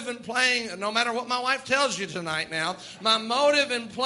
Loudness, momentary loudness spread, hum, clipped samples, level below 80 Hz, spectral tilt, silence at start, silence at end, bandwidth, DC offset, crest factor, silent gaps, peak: -25 LUFS; 8 LU; none; under 0.1%; -68 dBFS; -2 dB/octave; 0 s; 0 s; 11.5 kHz; under 0.1%; 20 dB; none; -6 dBFS